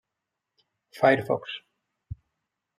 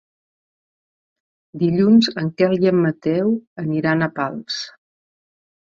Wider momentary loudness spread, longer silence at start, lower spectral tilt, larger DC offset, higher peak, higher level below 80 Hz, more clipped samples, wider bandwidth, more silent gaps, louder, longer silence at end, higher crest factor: first, 23 LU vs 12 LU; second, 0.95 s vs 1.55 s; about the same, -6.5 dB/octave vs -7 dB/octave; neither; second, -8 dBFS vs -4 dBFS; about the same, -60 dBFS vs -60 dBFS; neither; first, 14 kHz vs 7.4 kHz; second, none vs 3.47-3.56 s; second, -24 LUFS vs -19 LUFS; second, 0.65 s vs 0.9 s; first, 22 dB vs 16 dB